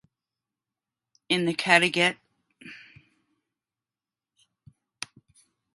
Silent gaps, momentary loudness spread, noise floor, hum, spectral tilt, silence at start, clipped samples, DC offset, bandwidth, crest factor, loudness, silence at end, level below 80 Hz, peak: none; 26 LU; under -90 dBFS; none; -3.5 dB/octave; 1.3 s; under 0.1%; under 0.1%; 11.5 kHz; 30 dB; -22 LUFS; 3 s; -74 dBFS; -2 dBFS